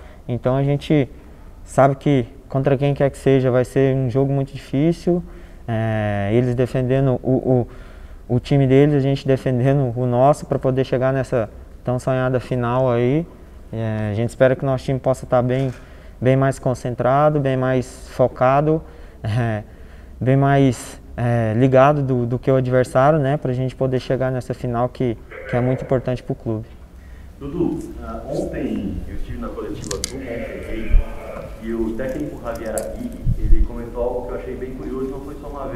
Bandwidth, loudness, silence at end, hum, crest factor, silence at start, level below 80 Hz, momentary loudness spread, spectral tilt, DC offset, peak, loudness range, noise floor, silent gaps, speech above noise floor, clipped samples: 13 kHz; -20 LUFS; 0 s; none; 20 dB; 0 s; -30 dBFS; 13 LU; -7.5 dB/octave; under 0.1%; 0 dBFS; 9 LU; -39 dBFS; none; 20 dB; under 0.1%